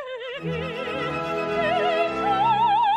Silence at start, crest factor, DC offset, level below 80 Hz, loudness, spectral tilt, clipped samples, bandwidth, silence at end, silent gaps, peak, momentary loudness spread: 0 s; 12 dB; under 0.1%; -54 dBFS; -24 LUFS; -5.5 dB/octave; under 0.1%; 12 kHz; 0 s; none; -10 dBFS; 10 LU